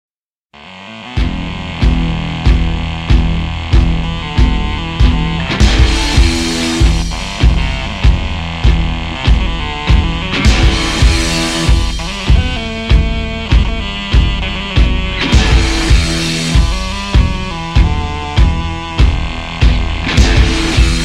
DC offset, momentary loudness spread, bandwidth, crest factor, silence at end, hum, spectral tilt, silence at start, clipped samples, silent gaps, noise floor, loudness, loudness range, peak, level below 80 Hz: under 0.1%; 7 LU; 11.5 kHz; 12 dB; 0 s; none; -5 dB/octave; 0.6 s; under 0.1%; none; -47 dBFS; -14 LUFS; 2 LU; 0 dBFS; -14 dBFS